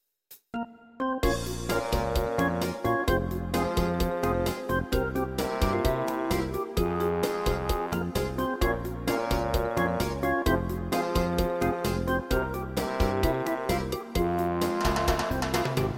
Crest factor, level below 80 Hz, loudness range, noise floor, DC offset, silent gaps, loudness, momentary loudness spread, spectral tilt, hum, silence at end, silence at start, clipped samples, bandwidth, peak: 18 dB; -36 dBFS; 1 LU; -56 dBFS; under 0.1%; none; -28 LUFS; 4 LU; -5.5 dB/octave; none; 0 s; 0.3 s; under 0.1%; 17 kHz; -10 dBFS